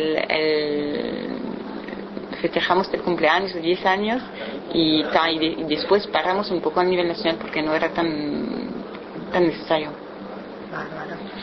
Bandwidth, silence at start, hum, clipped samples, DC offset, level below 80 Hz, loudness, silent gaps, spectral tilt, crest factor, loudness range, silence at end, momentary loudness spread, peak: 6.2 kHz; 0 s; none; under 0.1%; under 0.1%; -54 dBFS; -23 LUFS; none; -6.5 dB/octave; 22 dB; 4 LU; 0 s; 13 LU; -2 dBFS